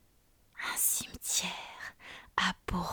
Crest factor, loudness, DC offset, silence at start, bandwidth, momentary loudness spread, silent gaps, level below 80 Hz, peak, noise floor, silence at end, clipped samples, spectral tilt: 20 dB; -32 LUFS; under 0.1%; 0.55 s; over 20 kHz; 17 LU; none; -54 dBFS; -14 dBFS; -66 dBFS; 0 s; under 0.1%; -1.5 dB/octave